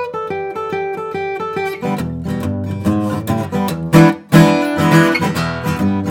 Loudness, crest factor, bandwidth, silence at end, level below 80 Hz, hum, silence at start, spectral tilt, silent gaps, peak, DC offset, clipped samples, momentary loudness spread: -16 LUFS; 16 dB; 17 kHz; 0 s; -46 dBFS; none; 0 s; -6.5 dB/octave; none; 0 dBFS; under 0.1%; 0.1%; 11 LU